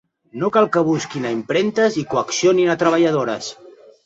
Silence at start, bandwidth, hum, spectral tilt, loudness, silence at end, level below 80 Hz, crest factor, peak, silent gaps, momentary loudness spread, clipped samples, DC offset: 0.35 s; 8 kHz; none; -5 dB/octave; -18 LUFS; 0.35 s; -62 dBFS; 16 dB; -2 dBFS; none; 9 LU; under 0.1%; under 0.1%